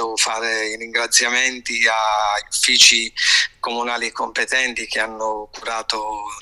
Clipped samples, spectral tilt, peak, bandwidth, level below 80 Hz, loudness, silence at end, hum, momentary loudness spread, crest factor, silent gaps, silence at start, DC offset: under 0.1%; 2 dB/octave; 0 dBFS; 16 kHz; -54 dBFS; -17 LUFS; 0 s; none; 14 LU; 20 dB; none; 0 s; under 0.1%